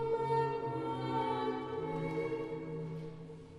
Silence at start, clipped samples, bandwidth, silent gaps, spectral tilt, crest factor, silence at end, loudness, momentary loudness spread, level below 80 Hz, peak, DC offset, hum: 0 s; under 0.1%; 10.5 kHz; none; -8 dB/octave; 16 dB; 0 s; -37 LUFS; 10 LU; -66 dBFS; -20 dBFS; under 0.1%; none